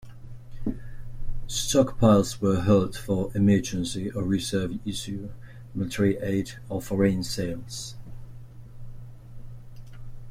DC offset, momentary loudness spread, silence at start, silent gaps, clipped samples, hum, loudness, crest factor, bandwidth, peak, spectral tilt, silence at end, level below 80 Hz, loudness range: under 0.1%; 24 LU; 0 s; none; under 0.1%; none; -26 LUFS; 22 dB; 15.5 kHz; -6 dBFS; -6 dB/octave; 0 s; -42 dBFS; 8 LU